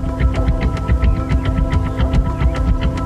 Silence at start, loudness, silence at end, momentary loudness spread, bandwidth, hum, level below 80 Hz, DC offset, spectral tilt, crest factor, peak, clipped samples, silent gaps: 0 s; -18 LUFS; 0 s; 2 LU; 8.4 kHz; none; -18 dBFS; under 0.1%; -8 dB/octave; 12 dB; -4 dBFS; under 0.1%; none